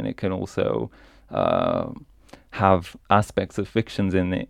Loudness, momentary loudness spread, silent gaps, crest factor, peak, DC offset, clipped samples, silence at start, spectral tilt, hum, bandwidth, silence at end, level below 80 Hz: -24 LUFS; 12 LU; none; 22 dB; -2 dBFS; under 0.1%; under 0.1%; 0 s; -7 dB/octave; none; 14 kHz; 0.05 s; -50 dBFS